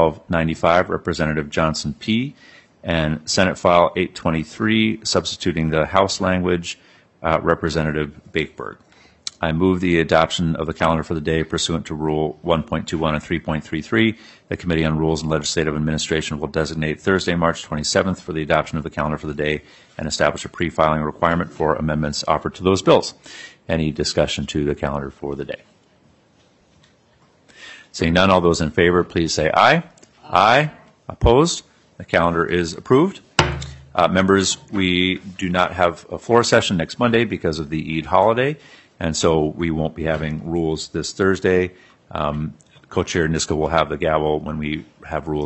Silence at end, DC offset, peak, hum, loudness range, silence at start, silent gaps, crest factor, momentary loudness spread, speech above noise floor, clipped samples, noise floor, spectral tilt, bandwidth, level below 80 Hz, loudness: 0 s; under 0.1%; 0 dBFS; none; 4 LU; 0 s; none; 20 dB; 11 LU; 37 dB; under 0.1%; -56 dBFS; -5 dB/octave; 8.6 kHz; -42 dBFS; -20 LUFS